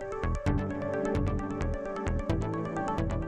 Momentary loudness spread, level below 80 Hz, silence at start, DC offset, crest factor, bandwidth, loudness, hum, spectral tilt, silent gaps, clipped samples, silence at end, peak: 4 LU; -38 dBFS; 0 s; under 0.1%; 14 dB; 9.8 kHz; -32 LUFS; none; -7.5 dB/octave; none; under 0.1%; 0 s; -16 dBFS